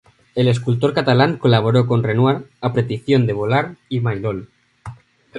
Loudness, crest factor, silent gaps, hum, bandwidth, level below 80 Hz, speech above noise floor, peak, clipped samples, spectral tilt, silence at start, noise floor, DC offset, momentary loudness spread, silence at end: -18 LUFS; 18 dB; none; none; 9.6 kHz; -52 dBFS; 21 dB; 0 dBFS; under 0.1%; -8 dB/octave; 0.35 s; -38 dBFS; under 0.1%; 12 LU; 0 s